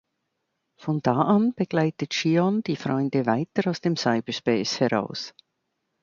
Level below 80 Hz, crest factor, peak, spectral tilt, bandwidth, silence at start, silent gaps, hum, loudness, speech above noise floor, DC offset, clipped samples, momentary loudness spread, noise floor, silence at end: -66 dBFS; 18 dB; -6 dBFS; -6 dB/octave; 7.4 kHz; 0.8 s; none; none; -24 LUFS; 54 dB; under 0.1%; under 0.1%; 7 LU; -78 dBFS; 0.75 s